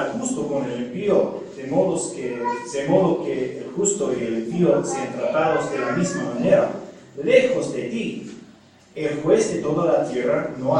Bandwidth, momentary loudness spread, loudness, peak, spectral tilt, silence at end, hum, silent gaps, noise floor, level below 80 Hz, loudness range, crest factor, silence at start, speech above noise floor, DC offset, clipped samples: 10.5 kHz; 9 LU; -22 LUFS; -2 dBFS; -5.5 dB/octave; 0 s; none; none; -50 dBFS; -62 dBFS; 2 LU; 20 dB; 0 s; 28 dB; under 0.1%; under 0.1%